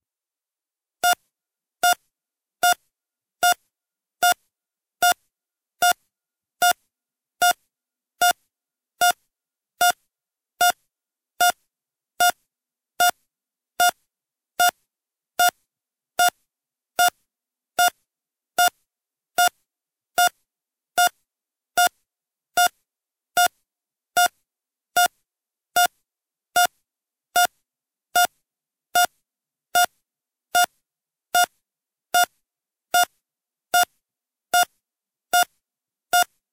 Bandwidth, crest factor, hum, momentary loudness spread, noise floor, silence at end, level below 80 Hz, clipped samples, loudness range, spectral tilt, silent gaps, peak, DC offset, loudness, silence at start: 17 kHz; 20 dB; none; 6 LU; under -90 dBFS; 0.3 s; -72 dBFS; under 0.1%; 1 LU; 1.5 dB/octave; none; -4 dBFS; under 0.1%; -22 LUFS; 1.05 s